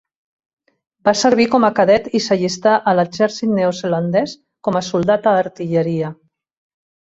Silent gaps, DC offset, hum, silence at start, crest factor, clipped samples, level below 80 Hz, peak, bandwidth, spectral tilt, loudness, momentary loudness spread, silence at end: none; under 0.1%; none; 1.05 s; 16 dB; under 0.1%; -56 dBFS; -2 dBFS; 8 kHz; -5.5 dB/octave; -16 LUFS; 7 LU; 0.95 s